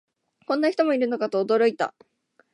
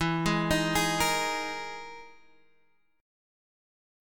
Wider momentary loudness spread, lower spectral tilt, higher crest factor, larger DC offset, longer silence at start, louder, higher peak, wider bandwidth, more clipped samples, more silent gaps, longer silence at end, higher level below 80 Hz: second, 8 LU vs 17 LU; first, -5.5 dB/octave vs -4 dB/octave; about the same, 16 dB vs 18 dB; neither; first, 0.5 s vs 0 s; first, -23 LUFS vs -28 LUFS; about the same, -10 dBFS vs -12 dBFS; second, 11 kHz vs 17.5 kHz; neither; neither; second, 0.65 s vs 1 s; second, -82 dBFS vs -50 dBFS